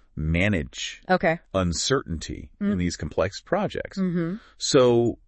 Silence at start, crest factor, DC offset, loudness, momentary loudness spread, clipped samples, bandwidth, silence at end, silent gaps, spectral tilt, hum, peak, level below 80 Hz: 0.15 s; 18 dB; under 0.1%; -25 LUFS; 12 LU; under 0.1%; 8.8 kHz; 0.1 s; none; -5 dB/octave; none; -6 dBFS; -44 dBFS